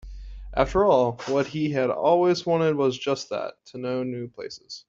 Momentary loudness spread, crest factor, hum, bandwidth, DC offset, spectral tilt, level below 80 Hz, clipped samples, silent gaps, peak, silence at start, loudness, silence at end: 16 LU; 20 dB; none; 7.6 kHz; under 0.1%; -6 dB/octave; -44 dBFS; under 0.1%; none; -4 dBFS; 0.05 s; -24 LUFS; 0.1 s